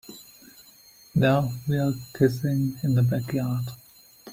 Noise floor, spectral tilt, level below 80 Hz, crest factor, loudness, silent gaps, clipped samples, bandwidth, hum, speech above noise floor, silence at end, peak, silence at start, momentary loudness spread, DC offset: -53 dBFS; -7.5 dB/octave; -56 dBFS; 18 dB; -25 LUFS; none; under 0.1%; 16 kHz; none; 29 dB; 0 s; -8 dBFS; 0.1 s; 14 LU; under 0.1%